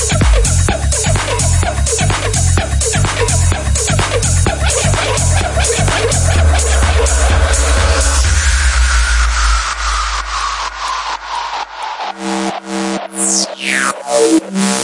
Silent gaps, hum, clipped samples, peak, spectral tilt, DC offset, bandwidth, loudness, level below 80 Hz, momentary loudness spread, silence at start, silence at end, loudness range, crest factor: none; none; under 0.1%; 0 dBFS; -3.5 dB/octave; under 0.1%; 11.5 kHz; -13 LUFS; -18 dBFS; 7 LU; 0 s; 0 s; 5 LU; 12 dB